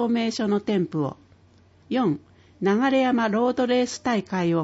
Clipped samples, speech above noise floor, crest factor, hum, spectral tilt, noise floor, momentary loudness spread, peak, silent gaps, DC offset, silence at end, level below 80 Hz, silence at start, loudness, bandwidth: under 0.1%; 33 dB; 14 dB; none; -6 dB/octave; -56 dBFS; 8 LU; -10 dBFS; none; under 0.1%; 0 s; -64 dBFS; 0 s; -24 LUFS; 8 kHz